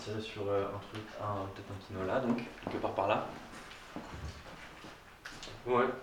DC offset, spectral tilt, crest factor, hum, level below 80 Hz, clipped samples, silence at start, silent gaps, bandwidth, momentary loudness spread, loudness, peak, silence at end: under 0.1%; -6 dB/octave; 22 dB; none; -58 dBFS; under 0.1%; 0 s; none; 19 kHz; 16 LU; -37 LUFS; -16 dBFS; 0 s